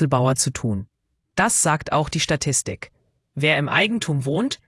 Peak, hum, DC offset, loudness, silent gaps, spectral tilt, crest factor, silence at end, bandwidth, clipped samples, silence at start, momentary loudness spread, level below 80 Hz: -4 dBFS; none; under 0.1%; -20 LUFS; none; -3.5 dB/octave; 18 dB; 0.1 s; 12 kHz; under 0.1%; 0 s; 13 LU; -50 dBFS